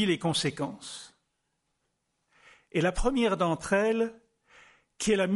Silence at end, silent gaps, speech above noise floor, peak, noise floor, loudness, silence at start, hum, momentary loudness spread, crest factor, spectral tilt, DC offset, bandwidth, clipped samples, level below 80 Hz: 0 s; none; 51 dB; -12 dBFS; -79 dBFS; -28 LUFS; 0 s; none; 10 LU; 18 dB; -4.5 dB/octave; under 0.1%; 11.5 kHz; under 0.1%; -44 dBFS